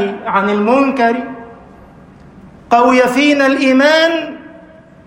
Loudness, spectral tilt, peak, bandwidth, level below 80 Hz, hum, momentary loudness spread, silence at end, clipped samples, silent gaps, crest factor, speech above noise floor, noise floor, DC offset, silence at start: -12 LUFS; -4.5 dB/octave; 0 dBFS; 16 kHz; -52 dBFS; none; 16 LU; 0.5 s; under 0.1%; none; 14 dB; 28 dB; -40 dBFS; under 0.1%; 0 s